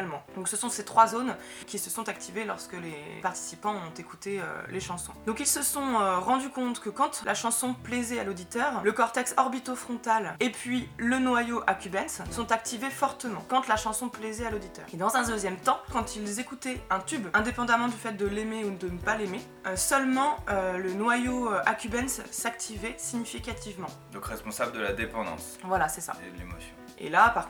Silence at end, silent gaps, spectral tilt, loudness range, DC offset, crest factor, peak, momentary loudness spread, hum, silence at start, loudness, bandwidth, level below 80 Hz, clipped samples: 0 s; none; -3 dB/octave; 6 LU; under 0.1%; 24 dB; -6 dBFS; 11 LU; none; 0 s; -29 LUFS; over 20 kHz; -52 dBFS; under 0.1%